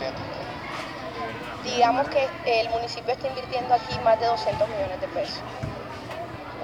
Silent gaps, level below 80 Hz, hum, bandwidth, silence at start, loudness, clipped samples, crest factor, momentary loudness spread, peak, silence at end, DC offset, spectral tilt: none; -52 dBFS; none; 14 kHz; 0 s; -27 LUFS; under 0.1%; 20 dB; 12 LU; -8 dBFS; 0 s; under 0.1%; -4.5 dB/octave